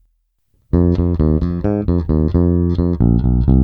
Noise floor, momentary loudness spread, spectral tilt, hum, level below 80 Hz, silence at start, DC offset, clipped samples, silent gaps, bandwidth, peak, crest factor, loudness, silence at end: -63 dBFS; 4 LU; -12 dB/octave; none; -22 dBFS; 0.75 s; under 0.1%; under 0.1%; none; 4.7 kHz; -2 dBFS; 14 dB; -16 LUFS; 0 s